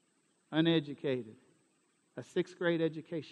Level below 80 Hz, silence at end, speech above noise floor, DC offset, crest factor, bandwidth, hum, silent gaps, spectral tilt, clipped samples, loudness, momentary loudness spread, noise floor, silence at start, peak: -82 dBFS; 0 s; 41 dB; under 0.1%; 20 dB; 9 kHz; none; none; -7 dB/octave; under 0.1%; -34 LUFS; 18 LU; -74 dBFS; 0.5 s; -16 dBFS